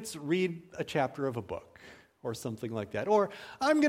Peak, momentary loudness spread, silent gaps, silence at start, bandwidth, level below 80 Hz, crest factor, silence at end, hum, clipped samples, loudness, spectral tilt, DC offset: -14 dBFS; 14 LU; none; 0 s; 16 kHz; -68 dBFS; 18 dB; 0 s; none; under 0.1%; -33 LUFS; -5.5 dB/octave; under 0.1%